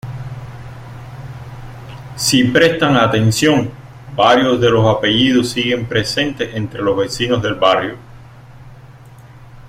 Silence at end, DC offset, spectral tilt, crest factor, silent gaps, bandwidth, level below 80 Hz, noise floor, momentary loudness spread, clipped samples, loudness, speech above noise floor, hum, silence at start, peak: 0 s; under 0.1%; -4.5 dB/octave; 16 dB; none; 16.5 kHz; -44 dBFS; -39 dBFS; 21 LU; under 0.1%; -14 LUFS; 25 dB; none; 0.05 s; 0 dBFS